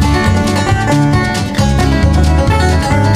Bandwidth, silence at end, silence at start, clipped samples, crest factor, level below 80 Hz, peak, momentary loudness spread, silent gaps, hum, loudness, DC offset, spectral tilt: 15 kHz; 0 s; 0 s; under 0.1%; 10 dB; -18 dBFS; 0 dBFS; 2 LU; none; none; -12 LUFS; under 0.1%; -6 dB/octave